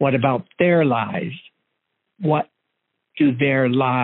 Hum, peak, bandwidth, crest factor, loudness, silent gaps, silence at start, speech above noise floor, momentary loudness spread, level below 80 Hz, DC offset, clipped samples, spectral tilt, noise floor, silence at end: none; -4 dBFS; 4.1 kHz; 16 dB; -20 LUFS; none; 0 s; 57 dB; 15 LU; -64 dBFS; under 0.1%; under 0.1%; -6 dB/octave; -76 dBFS; 0 s